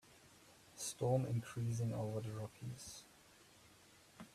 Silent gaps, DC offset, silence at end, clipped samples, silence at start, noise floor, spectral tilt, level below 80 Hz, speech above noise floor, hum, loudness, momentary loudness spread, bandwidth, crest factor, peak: none; under 0.1%; 0.05 s; under 0.1%; 0.05 s; -66 dBFS; -6 dB/octave; -72 dBFS; 25 dB; none; -42 LUFS; 26 LU; 14.5 kHz; 18 dB; -26 dBFS